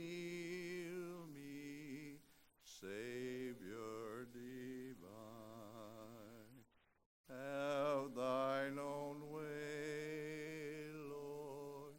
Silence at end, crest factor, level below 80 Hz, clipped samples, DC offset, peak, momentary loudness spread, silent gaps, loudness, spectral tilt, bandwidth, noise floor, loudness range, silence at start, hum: 0 s; 18 dB; -80 dBFS; under 0.1%; under 0.1%; -30 dBFS; 16 LU; 7.06-7.24 s; -48 LUFS; -5.5 dB/octave; 16 kHz; -71 dBFS; 10 LU; 0 s; none